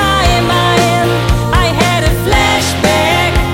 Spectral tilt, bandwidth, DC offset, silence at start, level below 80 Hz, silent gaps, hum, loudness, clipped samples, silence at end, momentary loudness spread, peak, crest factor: -4.5 dB/octave; 17.5 kHz; under 0.1%; 0 s; -20 dBFS; none; none; -11 LUFS; under 0.1%; 0 s; 2 LU; 0 dBFS; 10 dB